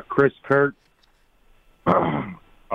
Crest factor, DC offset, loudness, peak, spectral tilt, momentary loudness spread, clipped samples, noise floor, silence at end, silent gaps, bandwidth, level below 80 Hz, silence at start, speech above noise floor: 18 dB; under 0.1%; -22 LUFS; -6 dBFS; -9 dB/octave; 9 LU; under 0.1%; -60 dBFS; 0 s; none; 5.8 kHz; -54 dBFS; 0.1 s; 40 dB